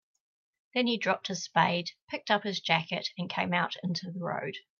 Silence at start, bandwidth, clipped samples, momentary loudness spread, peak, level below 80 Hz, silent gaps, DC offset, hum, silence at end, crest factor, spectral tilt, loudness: 0.75 s; 7.2 kHz; under 0.1%; 8 LU; -10 dBFS; -78 dBFS; 2.02-2.08 s; under 0.1%; none; 0.2 s; 22 dB; -4.5 dB/octave; -30 LUFS